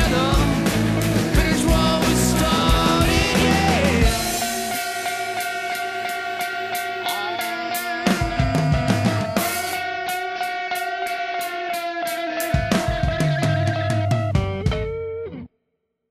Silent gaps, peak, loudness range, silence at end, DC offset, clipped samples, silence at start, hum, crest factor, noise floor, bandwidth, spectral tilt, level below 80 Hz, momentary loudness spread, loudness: none; -4 dBFS; 6 LU; 0.65 s; under 0.1%; under 0.1%; 0 s; none; 16 dB; -74 dBFS; 15.5 kHz; -4.5 dB/octave; -30 dBFS; 8 LU; -21 LUFS